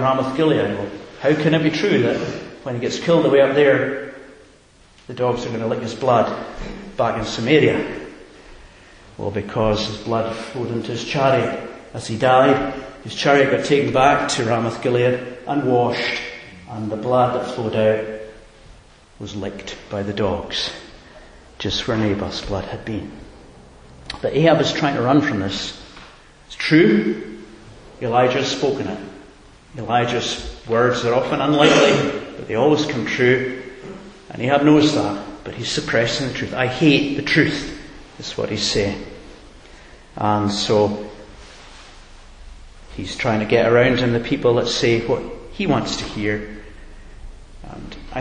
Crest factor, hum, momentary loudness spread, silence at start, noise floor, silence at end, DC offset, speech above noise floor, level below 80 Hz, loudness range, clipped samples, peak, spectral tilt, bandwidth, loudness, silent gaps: 20 dB; none; 18 LU; 0 s; -50 dBFS; 0 s; under 0.1%; 31 dB; -44 dBFS; 7 LU; under 0.1%; 0 dBFS; -5.5 dB/octave; 10 kHz; -19 LUFS; none